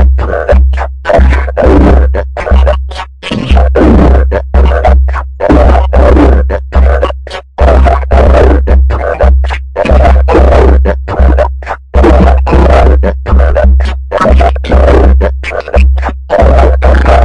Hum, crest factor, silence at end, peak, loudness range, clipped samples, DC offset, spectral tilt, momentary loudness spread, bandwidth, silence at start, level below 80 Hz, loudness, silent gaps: none; 6 dB; 0 s; 0 dBFS; 1 LU; 3%; 1%; -8.5 dB/octave; 8 LU; 6.2 kHz; 0 s; -8 dBFS; -8 LUFS; none